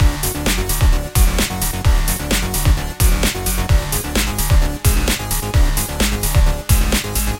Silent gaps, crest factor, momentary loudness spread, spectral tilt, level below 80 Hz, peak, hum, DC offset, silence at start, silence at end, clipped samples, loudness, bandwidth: none; 14 dB; 3 LU; -4 dB/octave; -18 dBFS; -2 dBFS; none; 0.1%; 0 s; 0 s; under 0.1%; -17 LUFS; 17 kHz